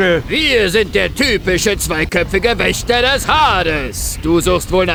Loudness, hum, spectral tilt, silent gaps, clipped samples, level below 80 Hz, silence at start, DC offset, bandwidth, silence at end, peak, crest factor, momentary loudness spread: -14 LUFS; none; -3.5 dB/octave; none; under 0.1%; -28 dBFS; 0 s; under 0.1%; over 20 kHz; 0 s; 0 dBFS; 14 dB; 4 LU